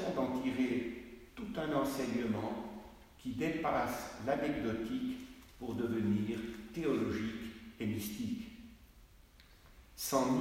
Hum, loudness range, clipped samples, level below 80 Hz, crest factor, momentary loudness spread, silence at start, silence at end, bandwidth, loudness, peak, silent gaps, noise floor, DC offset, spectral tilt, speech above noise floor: none; 4 LU; under 0.1%; -60 dBFS; 20 dB; 14 LU; 0 s; 0 s; 16 kHz; -37 LUFS; -16 dBFS; none; -61 dBFS; under 0.1%; -5.5 dB/octave; 25 dB